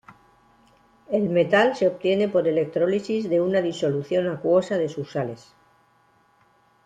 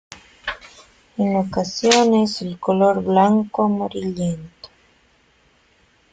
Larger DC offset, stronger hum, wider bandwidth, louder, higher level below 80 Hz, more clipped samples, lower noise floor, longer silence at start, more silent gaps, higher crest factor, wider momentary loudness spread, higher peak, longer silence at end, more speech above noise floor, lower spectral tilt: neither; neither; about the same, 9.2 kHz vs 9.4 kHz; second, -23 LUFS vs -19 LUFS; second, -66 dBFS vs -56 dBFS; neither; about the same, -61 dBFS vs -58 dBFS; about the same, 0.1 s vs 0.1 s; neither; about the same, 18 dB vs 20 dB; second, 9 LU vs 16 LU; second, -6 dBFS vs -2 dBFS; about the same, 1.5 s vs 1.45 s; about the same, 39 dB vs 40 dB; first, -6.5 dB/octave vs -5 dB/octave